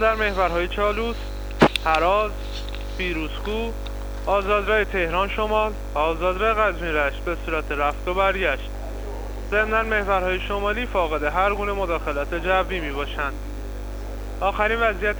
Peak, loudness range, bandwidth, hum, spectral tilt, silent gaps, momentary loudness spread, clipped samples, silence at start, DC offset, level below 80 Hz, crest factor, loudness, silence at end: -6 dBFS; 2 LU; over 20 kHz; 50 Hz at -30 dBFS; -5.5 dB/octave; none; 13 LU; under 0.1%; 0 s; under 0.1%; -32 dBFS; 18 dB; -23 LUFS; 0 s